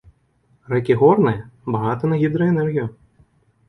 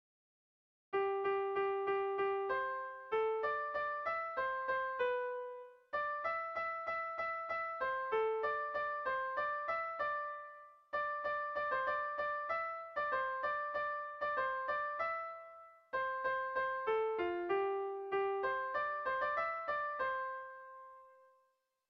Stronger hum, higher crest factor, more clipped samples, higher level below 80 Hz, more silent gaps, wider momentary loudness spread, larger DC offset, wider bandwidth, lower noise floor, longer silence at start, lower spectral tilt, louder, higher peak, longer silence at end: neither; about the same, 18 dB vs 14 dB; neither; first, -54 dBFS vs -74 dBFS; neither; first, 11 LU vs 7 LU; neither; about the same, 5.8 kHz vs 6 kHz; second, -61 dBFS vs -79 dBFS; second, 0.7 s vs 0.9 s; first, -10 dB/octave vs -5.5 dB/octave; first, -19 LUFS vs -38 LUFS; first, -2 dBFS vs -24 dBFS; about the same, 0.75 s vs 0.75 s